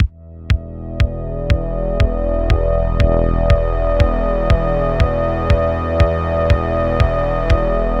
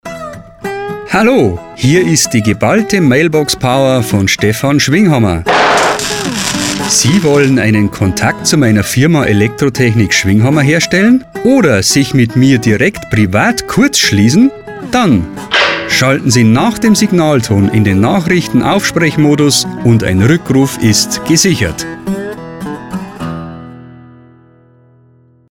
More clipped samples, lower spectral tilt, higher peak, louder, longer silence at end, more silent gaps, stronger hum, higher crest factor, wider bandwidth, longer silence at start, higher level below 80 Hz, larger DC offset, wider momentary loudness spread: neither; first, -8 dB/octave vs -4.5 dB/octave; about the same, 0 dBFS vs 0 dBFS; second, -17 LUFS vs -10 LUFS; second, 0 s vs 1.65 s; neither; neither; about the same, 14 dB vs 10 dB; second, 7.6 kHz vs 17.5 kHz; about the same, 0 s vs 0.05 s; first, -18 dBFS vs -38 dBFS; first, 1% vs under 0.1%; second, 5 LU vs 12 LU